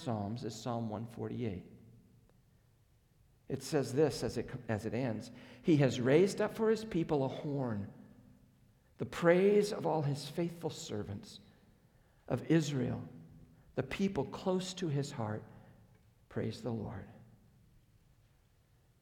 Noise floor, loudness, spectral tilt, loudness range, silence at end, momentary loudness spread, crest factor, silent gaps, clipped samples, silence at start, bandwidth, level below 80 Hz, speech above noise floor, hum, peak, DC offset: -69 dBFS; -35 LUFS; -6.5 dB/octave; 10 LU; 1.75 s; 16 LU; 22 dB; none; under 0.1%; 0 s; 17.5 kHz; -66 dBFS; 34 dB; none; -14 dBFS; under 0.1%